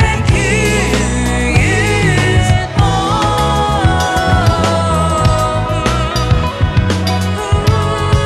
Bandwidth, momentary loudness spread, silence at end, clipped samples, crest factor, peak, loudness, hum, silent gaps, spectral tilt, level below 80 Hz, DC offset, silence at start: 14 kHz; 3 LU; 0 s; under 0.1%; 12 dB; 0 dBFS; -13 LUFS; none; none; -5 dB/octave; -20 dBFS; under 0.1%; 0 s